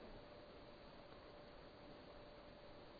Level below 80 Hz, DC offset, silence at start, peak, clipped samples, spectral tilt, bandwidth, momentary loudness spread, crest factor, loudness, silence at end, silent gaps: -68 dBFS; under 0.1%; 0 s; -44 dBFS; under 0.1%; -3.5 dB/octave; 5.4 kHz; 1 LU; 14 dB; -60 LUFS; 0 s; none